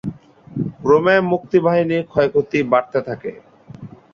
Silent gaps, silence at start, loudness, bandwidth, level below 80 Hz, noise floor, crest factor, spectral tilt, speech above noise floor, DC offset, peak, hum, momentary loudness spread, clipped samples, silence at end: none; 0.05 s; -17 LUFS; 7 kHz; -54 dBFS; -38 dBFS; 16 dB; -7.5 dB/octave; 21 dB; under 0.1%; -2 dBFS; none; 17 LU; under 0.1%; 0.25 s